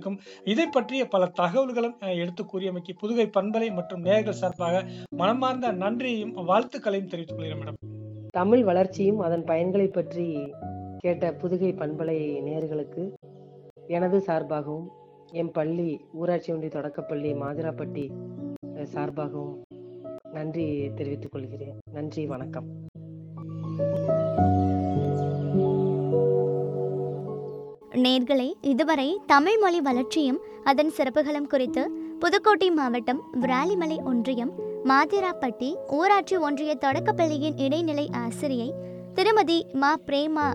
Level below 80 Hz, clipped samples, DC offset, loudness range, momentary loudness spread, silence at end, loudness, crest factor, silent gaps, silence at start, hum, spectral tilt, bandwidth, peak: -66 dBFS; under 0.1%; under 0.1%; 10 LU; 15 LU; 0 s; -26 LUFS; 20 dB; 13.70-13.76 s, 18.56-18.62 s, 19.64-19.70 s, 21.81-21.86 s, 22.88-22.94 s; 0 s; none; -6.5 dB/octave; 13.5 kHz; -6 dBFS